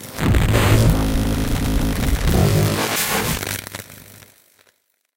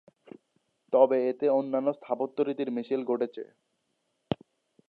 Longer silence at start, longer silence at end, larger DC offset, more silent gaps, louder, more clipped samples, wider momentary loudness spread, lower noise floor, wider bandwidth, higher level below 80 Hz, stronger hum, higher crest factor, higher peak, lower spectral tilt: second, 0 s vs 0.9 s; first, 1.15 s vs 0.55 s; neither; neither; first, -19 LUFS vs -28 LUFS; neither; second, 10 LU vs 13 LU; second, -62 dBFS vs -77 dBFS; first, 17 kHz vs 4.7 kHz; first, -24 dBFS vs -70 dBFS; neither; second, 16 dB vs 22 dB; first, -2 dBFS vs -8 dBFS; second, -5 dB/octave vs -9 dB/octave